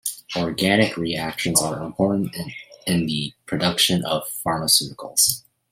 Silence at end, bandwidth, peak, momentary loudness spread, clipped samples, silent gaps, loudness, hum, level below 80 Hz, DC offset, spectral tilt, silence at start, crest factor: 0.3 s; 16.5 kHz; -2 dBFS; 10 LU; under 0.1%; none; -21 LUFS; none; -56 dBFS; under 0.1%; -3 dB/octave; 0.05 s; 20 dB